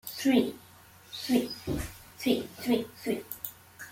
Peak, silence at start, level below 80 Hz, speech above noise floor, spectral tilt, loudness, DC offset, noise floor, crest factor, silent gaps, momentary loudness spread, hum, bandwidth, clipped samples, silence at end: -12 dBFS; 0.05 s; -54 dBFS; 26 dB; -4.5 dB/octave; -31 LUFS; under 0.1%; -54 dBFS; 20 dB; none; 15 LU; none; 16.5 kHz; under 0.1%; 0 s